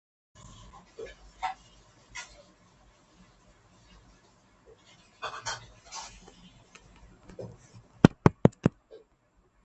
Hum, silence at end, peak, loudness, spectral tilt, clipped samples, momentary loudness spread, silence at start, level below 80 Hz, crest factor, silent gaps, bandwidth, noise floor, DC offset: none; 0.95 s; 0 dBFS; -29 LUFS; -6.5 dB/octave; under 0.1%; 27 LU; 1 s; -52 dBFS; 34 dB; none; 8.4 kHz; -67 dBFS; under 0.1%